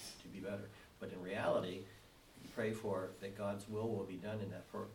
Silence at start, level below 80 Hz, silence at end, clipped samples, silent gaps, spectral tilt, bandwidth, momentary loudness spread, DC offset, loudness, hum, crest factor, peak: 0 s; -70 dBFS; 0 s; under 0.1%; none; -6 dB/octave; 18.5 kHz; 16 LU; under 0.1%; -43 LUFS; none; 20 dB; -24 dBFS